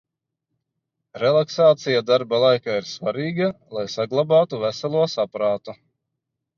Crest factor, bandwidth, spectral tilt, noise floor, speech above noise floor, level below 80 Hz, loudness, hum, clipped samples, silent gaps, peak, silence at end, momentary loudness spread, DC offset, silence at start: 16 dB; 7.2 kHz; -5.5 dB/octave; -81 dBFS; 61 dB; -68 dBFS; -21 LUFS; none; under 0.1%; none; -4 dBFS; 0.85 s; 9 LU; under 0.1%; 1.15 s